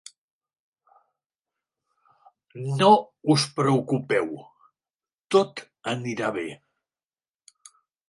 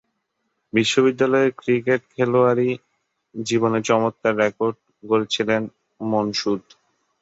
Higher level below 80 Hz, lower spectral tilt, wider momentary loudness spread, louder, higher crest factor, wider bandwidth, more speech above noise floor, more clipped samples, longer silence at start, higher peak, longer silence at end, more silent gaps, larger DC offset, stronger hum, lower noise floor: second, -72 dBFS vs -64 dBFS; about the same, -5.5 dB/octave vs -5 dB/octave; first, 16 LU vs 11 LU; second, -24 LUFS vs -21 LUFS; first, 24 dB vs 18 dB; first, 11.5 kHz vs 8 kHz; first, over 67 dB vs 54 dB; neither; first, 2.55 s vs 0.75 s; about the same, -4 dBFS vs -4 dBFS; first, 1.55 s vs 0.6 s; first, 4.90-4.99 s, 5.14-5.18 s vs none; neither; neither; first, under -90 dBFS vs -74 dBFS